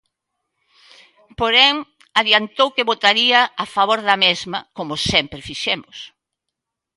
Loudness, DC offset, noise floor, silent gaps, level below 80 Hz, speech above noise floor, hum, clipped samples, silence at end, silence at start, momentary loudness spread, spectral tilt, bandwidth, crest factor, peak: -16 LUFS; under 0.1%; -81 dBFS; none; -52 dBFS; 63 dB; none; under 0.1%; 0.9 s; 1.4 s; 15 LU; -2.5 dB/octave; 11.5 kHz; 20 dB; 0 dBFS